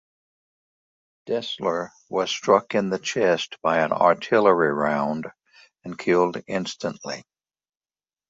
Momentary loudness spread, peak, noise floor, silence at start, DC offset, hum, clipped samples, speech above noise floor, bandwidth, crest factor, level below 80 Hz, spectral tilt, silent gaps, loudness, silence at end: 14 LU; -2 dBFS; under -90 dBFS; 1.25 s; under 0.1%; none; under 0.1%; over 67 dB; 7.8 kHz; 22 dB; -66 dBFS; -4.5 dB/octave; none; -23 LUFS; 1.1 s